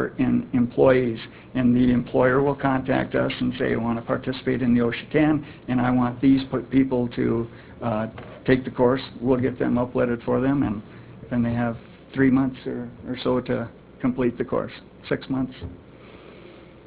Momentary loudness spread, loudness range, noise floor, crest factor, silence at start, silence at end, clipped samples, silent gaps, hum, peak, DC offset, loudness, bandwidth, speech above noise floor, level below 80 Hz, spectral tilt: 12 LU; 6 LU; -45 dBFS; 18 dB; 0 s; 0.2 s; under 0.1%; none; none; -4 dBFS; under 0.1%; -23 LUFS; 4 kHz; 23 dB; -46 dBFS; -11.5 dB/octave